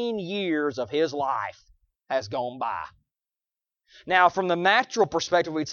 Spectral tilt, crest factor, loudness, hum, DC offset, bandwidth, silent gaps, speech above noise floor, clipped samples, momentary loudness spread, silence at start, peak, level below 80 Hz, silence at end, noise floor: -4 dB/octave; 22 dB; -25 LUFS; none; under 0.1%; 7.2 kHz; none; over 65 dB; under 0.1%; 11 LU; 0 s; -6 dBFS; -66 dBFS; 0 s; under -90 dBFS